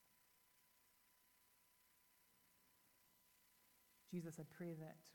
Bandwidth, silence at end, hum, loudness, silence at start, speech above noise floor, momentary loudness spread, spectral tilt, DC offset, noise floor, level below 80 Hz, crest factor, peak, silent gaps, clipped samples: 19 kHz; 0 s; none; -54 LUFS; 0.1 s; 24 dB; 4 LU; -6.5 dB/octave; under 0.1%; -77 dBFS; under -90 dBFS; 22 dB; -38 dBFS; none; under 0.1%